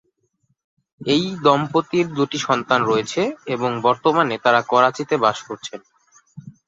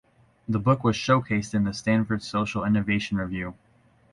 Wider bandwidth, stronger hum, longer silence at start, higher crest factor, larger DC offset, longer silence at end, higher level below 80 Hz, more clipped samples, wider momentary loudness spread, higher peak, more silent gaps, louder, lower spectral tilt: second, 7.8 kHz vs 11 kHz; neither; first, 1 s vs 0.5 s; about the same, 18 dB vs 18 dB; neither; second, 0.15 s vs 0.6 s; second, -62 dBFS vs -50 dBFS; neither; first, 13 LU vs 9 LU; first, -2 dBFS vs -8 dBFS; neither; first, -19 LUFS vs -25 LUFS; second, -5 dB/octave vs -6.5 dB/octave